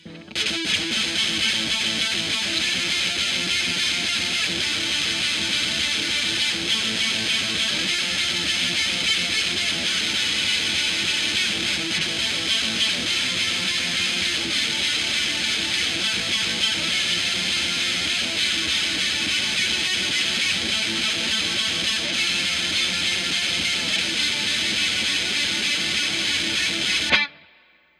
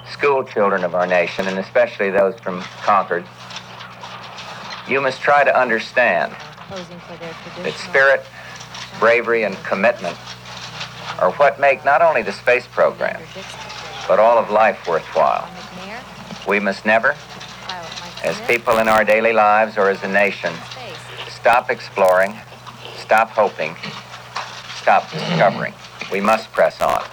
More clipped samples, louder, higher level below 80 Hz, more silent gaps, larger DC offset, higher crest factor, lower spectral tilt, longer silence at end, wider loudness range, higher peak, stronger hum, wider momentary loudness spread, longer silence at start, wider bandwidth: neither; second, -20 LUFS vs -17 LUFS; about the same, -54 dBFS vs -56 dBFS; neither; neither; about the same, 18 dB vs 16 dB; second, -0.5 dB/octave vs -4.5 dB/octave; first, 0.6 s vs 0 s; second, 1 LU vs 4 LU; about the same, -4 dBFS vs -2 dBFS; neither; second, 1 LU vs 18 LU; about the same, 0.05 s vs 0 s; second, 16 kHz vs over 20 kHz